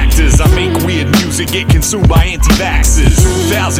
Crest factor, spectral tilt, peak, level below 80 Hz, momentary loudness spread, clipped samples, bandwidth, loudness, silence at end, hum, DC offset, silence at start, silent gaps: 10 dB; -4.5 dB/octave; 0 dBFS; -12 dBFS; 3 LU; under 0.1%; 16.5 kHz; -11 LUFS; 0 s; none; under 0.1%; 0 s; none